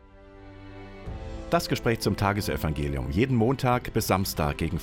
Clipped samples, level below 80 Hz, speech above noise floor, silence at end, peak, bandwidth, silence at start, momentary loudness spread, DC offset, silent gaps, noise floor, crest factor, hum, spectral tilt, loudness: under 0.1%; -40 dBFS; 22 dB; 0 s; -10 dBFS; 17 kHz; 0.15 s; 18 LU; under 0.1%; none; -48 dBFS; 18 dB; none; -5.5 dB/octave; -26 LUFS